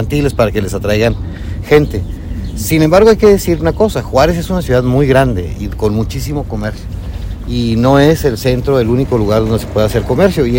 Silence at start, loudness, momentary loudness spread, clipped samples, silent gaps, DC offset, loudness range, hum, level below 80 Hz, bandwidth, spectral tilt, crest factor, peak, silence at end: 0 s; -12 LUFS; 13 LU; 0.9%; none; under 0.1%; 4 LU; none; -24 dBFS; 17 kHz; -6.5 dB/octave; 12 dB; 0 dBFS; 0 s